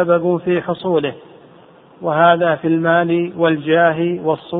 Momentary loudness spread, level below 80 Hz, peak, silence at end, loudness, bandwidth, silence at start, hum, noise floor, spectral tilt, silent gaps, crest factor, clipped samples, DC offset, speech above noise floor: 7 LU; -60 dBFS; 0 dBFS; 0 s; -16 LUFS; 4 kHz; 0 s; none; -45 dBFS; -10.5 dB/octave; none; 16 dB; under 0.1%; under 0.1%; 29 dB